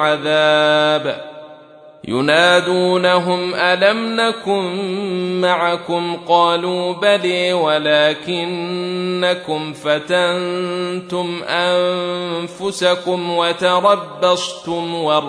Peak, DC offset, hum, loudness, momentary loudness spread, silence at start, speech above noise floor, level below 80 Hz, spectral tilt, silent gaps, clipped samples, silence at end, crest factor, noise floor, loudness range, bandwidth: -2 dBFS; under 0.1%; none; -17 LUFS; 9 LU; 0 s; 24 dB; -64 dBFS; -4.5 dB/octave; none; under 0.1%; 0 s; 16 dB; -41 dBFS; 4 LU; 11 kHz